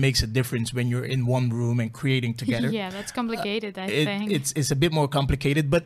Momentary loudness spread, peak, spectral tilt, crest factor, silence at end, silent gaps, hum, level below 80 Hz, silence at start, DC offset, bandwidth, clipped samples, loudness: 6 LU; -8 dBFS; -5.5 dB/octave; 16 dB; 0 s; none; none; -42 dBFS; 0 s; under 0.1%; 15 kHz; under 0.1%; -25 LUFS